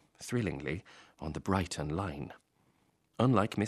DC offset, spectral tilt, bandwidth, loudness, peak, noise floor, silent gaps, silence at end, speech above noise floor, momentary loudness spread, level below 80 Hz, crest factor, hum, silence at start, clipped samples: under 0.1%; -6.5 dB/octave; 13.5 kHz; -34 LUFS; -12 dBFS; -72 dBFS; none; 0 s; 39 dB; 15 LU; -56 dBFS; 22 dB; none; 0.2 s; under 0.1%